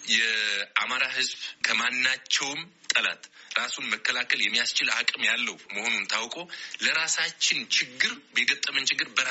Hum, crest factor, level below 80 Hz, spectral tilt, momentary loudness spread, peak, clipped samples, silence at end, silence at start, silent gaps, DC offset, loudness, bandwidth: none; 20 dB; -76 dBFS; 2.5 dB/octave; 6 LU; -6 dBFS; under 0.1%; 0 s; 0 s; none; under 0.1%; -25 LUFS; 8 kHz